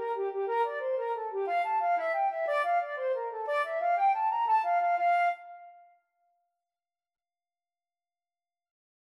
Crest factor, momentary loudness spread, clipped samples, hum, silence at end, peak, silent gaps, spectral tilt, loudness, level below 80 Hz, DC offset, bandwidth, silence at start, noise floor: 14 dB; 6 LU; under 0.1%; none; 3.35 s; -18 dBFS; none; -1 dB/octave; -29 LUFS; under -90 dBFS; under 0.1%; 11.5 kHz; 0 s; under -90 dBFS